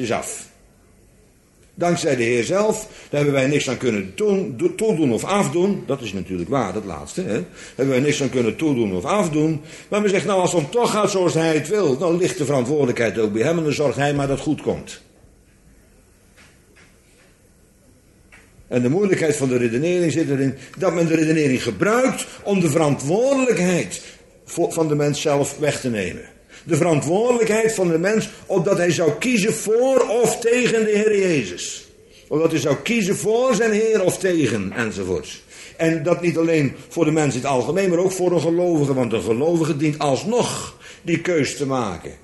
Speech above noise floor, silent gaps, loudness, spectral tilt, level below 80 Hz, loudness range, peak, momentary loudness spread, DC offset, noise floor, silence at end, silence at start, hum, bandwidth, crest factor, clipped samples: 34 dB; none; -20 LUFS; -5.5 dB/octave; -54 dBFS; 4 LU; -2 dBFS; 8 LU; under 0.1%; -53 dBFS; 0.1 s; 0 s; none; 12 kHz; 18 dB; under 0.1%